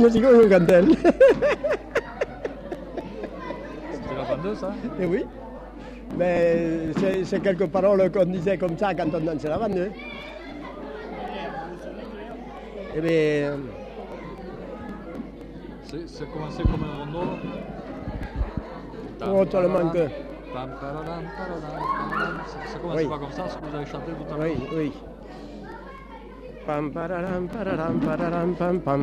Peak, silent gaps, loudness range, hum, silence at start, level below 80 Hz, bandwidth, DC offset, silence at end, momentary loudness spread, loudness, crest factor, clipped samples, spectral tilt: -6 dBFS; none; 9 LU; none; 0 s; -42 dBFS; 13 kHz; under 0.1%; 0 s; 18 LU; -24 LUFS; 18 dB; under 0.1%; -7.5 dB/octave